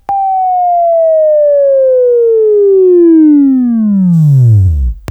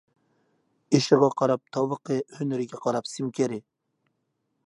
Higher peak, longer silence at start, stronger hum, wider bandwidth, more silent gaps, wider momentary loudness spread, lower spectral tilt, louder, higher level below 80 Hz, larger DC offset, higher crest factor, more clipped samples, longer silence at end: first, 0 dBFS vs -4 dBFS; second, 0.1 s vs 0.9 s; neither; second, 8.2 kHz vs 11.5 kHz; neither; second, 5 LU vs 10 LU; first, -12 dB/octave vs -6 dB/octave; first, -8 LUFS vs -26 LUFS; first, -24 dBFS vs -74 dBFS; neither; second, 6 dB vs 22 dB; neither; second, 0.1 s vs 1.05 s